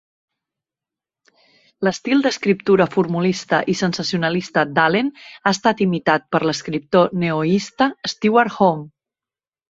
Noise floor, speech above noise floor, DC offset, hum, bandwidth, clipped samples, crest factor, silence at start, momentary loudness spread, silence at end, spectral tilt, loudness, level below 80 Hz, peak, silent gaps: under -90 dBFS; over 72 dB; under 0.1%; none; 7.8 kHz; under 0.1%; 18 dB; 1.8 s; 5 LU; 0.85 s; -5.5 dB/octave; -18 LUFS; -60 dBFS; -2 dBFS; none